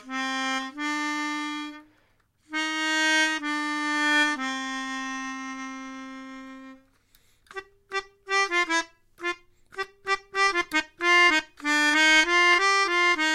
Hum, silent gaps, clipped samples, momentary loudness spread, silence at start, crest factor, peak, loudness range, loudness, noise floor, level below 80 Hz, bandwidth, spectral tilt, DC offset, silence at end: none; none; under 0.1%; 21 LU; 0.05 s; 20 dB; -6 dBFS; 13 LU; -23 LUFS; -65 dBFS; -62 dBFS; 16 kHz; 0 dB/octave; under 0.1%; 0 s